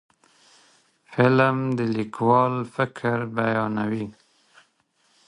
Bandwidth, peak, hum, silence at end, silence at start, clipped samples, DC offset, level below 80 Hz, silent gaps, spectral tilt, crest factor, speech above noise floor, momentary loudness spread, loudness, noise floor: 10.5 kHz; -2 dBFS; none; 1.15 s; 1.1 s; under 0.1%; under 0.1%; -64 dBFS; none; -8 dB/octave; 22 dB; 44 dB; 9 LU; -23 LUFS; -66 dBFS